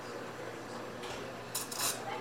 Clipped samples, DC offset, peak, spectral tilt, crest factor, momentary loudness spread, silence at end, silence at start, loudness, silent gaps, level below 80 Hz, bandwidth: under 0.1%; under 0.1%; -20 dBFS; -2 dB/octave; 20 dB; 10 LU; 0 s; 0 s; -38 LUFS; none; -70 dBFS; 17 kHz